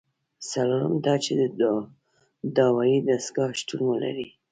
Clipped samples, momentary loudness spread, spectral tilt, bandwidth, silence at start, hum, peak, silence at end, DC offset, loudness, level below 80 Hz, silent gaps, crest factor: under 0.1%; 11 LU; -5.5 dB/octave; 9.4 kHz; 0.4 s; none; -8 dBFS; 0.25 s; under 0.1%; -25 LUFS; -68 dBFS; none; 18 dB